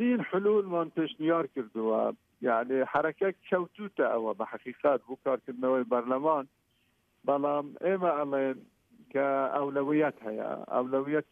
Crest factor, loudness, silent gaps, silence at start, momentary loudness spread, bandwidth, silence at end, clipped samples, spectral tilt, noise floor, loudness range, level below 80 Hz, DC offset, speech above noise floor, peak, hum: 16 dB; -30 LUFS; none; 0 s; 7 LU; 3.9 kHz; 0.1 s; under 0.1%; -8.5 dB/octave; -72 dBFS; 2 LU; -78 dBFS; under 0.1%; 42 dB; -14 dBFS; none